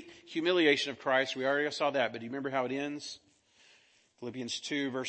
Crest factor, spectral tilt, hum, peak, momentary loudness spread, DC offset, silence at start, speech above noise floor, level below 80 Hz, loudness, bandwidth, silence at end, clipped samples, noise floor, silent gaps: 22 dB; -3.5 dB/octave; none; -12 dBFS; 15 LU; under 0.1%; 0 s; 34 dB; -82 dBFS; -31 LUFS; 8.8 kHz; 0 s; under 0.1%; -66 dBFS; none